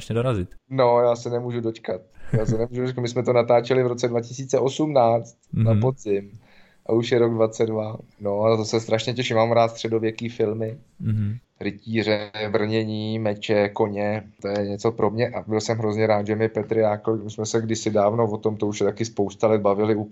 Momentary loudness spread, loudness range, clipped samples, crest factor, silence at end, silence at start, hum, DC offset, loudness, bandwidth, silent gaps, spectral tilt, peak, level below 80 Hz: 9 LU; 3 LU; under 0.1%; 16 dB; 0 s; 0 s; none; under 0.1%; -23 LUFS; 8.4 kHz; none; -6.5 dB/octave; -6 dBFS; -50 dBFS